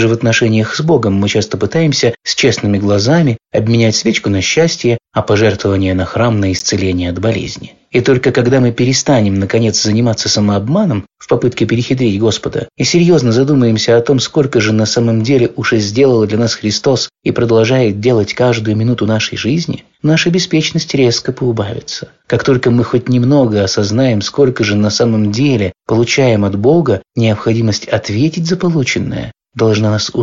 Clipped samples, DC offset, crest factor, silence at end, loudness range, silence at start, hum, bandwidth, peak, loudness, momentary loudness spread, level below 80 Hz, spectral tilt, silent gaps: under 0.1%; under 0.1%; 12 dB; 0 s; 2 LU; 0 s; none; 7.6 kHz; 0 dBFS; -12 LUFS; 5 LU; -44 dBFS; -5.5 dB/octave; none